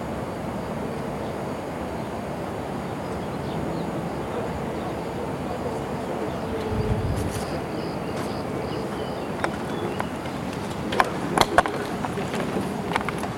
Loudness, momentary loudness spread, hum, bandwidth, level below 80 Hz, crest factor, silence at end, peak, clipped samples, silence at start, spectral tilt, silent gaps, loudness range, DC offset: -28 LUFS; 7 LU; none; 16.5 kHz; -42 dBFS; 28 dB; 0 s; 0 dBFS; under 0.1%; 0 s; -5.5 dB/octave; none; 5 LU; under 0.1%